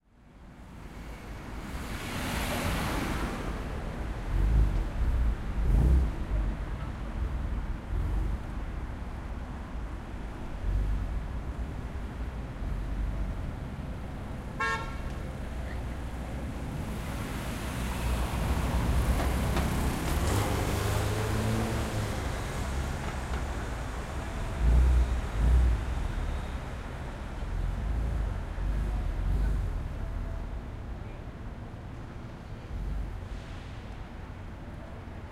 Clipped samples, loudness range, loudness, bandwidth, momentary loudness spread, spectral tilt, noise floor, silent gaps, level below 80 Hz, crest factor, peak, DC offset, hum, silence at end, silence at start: under 0.1%; 8 LU; -33 LUFS; 16 kHz; 14 LU; -6 dB/octave; -52 dBFS; none; -32 dBFS; 18 dB; -12 dBFS; under 0.1%; none; 0 s; 0.25 s